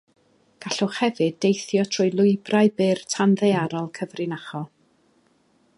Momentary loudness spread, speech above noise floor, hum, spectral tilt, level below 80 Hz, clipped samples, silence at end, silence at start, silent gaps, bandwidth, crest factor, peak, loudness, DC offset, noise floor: 12 LU; 41 dB; none; -5.5 dB/octave; -72 dBFS; under 0.1%; 1.1 s; 0.6 s; none; 11 kHz; 18 dB; -6 dBFS; -22 LUFS; under 0.1%; -63 dBFS